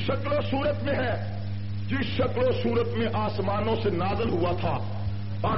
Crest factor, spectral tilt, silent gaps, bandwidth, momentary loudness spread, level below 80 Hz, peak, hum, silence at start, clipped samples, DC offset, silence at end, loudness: 12 dB; -5.5 dB/octave; none; 5.8 kHz; 7 LU; -46 dBFS; -14 dBFS; none; 0 s; under 0.1%; 2%; 0 s; -27 LUFS